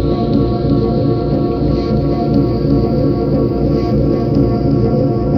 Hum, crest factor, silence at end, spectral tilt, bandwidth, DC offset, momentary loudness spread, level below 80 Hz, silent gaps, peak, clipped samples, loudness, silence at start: none; 12 dB; 0 s; -10.5 dB/octave; 6 kHz; under 0.1%; 2 LU; -24 dBFS; none; -2 dBFS; under 0.1%; -14 LUFS; 0 s